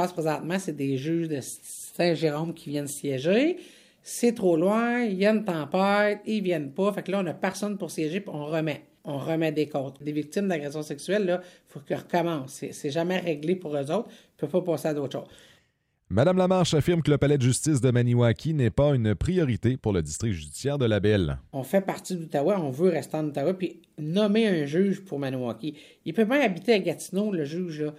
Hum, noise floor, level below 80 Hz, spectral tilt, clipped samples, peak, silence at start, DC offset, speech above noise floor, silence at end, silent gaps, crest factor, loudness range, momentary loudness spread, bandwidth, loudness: none; -71 dBFS; -50 dBFS; -6 dB/octave; under 0.1%; -8 dBFS; 0 s; under 0.1%; 45 dB; 0 s; none; 18 dB; 6 LU; 11 LU; 16 kHz; -26 LUFS